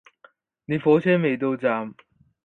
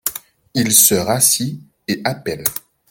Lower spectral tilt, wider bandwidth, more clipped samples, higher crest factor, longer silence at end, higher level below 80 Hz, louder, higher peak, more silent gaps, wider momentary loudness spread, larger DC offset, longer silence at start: first, -9 dB/octave vs -2.5 dB/octave; second, 4.3 kHz vs over 20 kHz; neither; about the same, 18 dB vs 18 dB; first, 0.5 s vs 0.3 s; second, -66 dBFS vs -54 dBFS; second, -22 LUFS vs -15 LUFS; second, -6 dBFS vs 0 dBFS; neither; second, 11 LU vs 18 LU; neither; first, 0.7 s vs 0.05 s